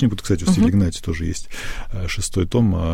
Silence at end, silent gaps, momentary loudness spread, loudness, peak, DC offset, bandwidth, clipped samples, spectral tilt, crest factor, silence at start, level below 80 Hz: 0 s; none; 14 LU; -20 LUFS; -4 dBFS; under 0.1%; 16 kHz; under 0.1%; -6 dB/octave; 14 dB; 0 s; -30 dBFS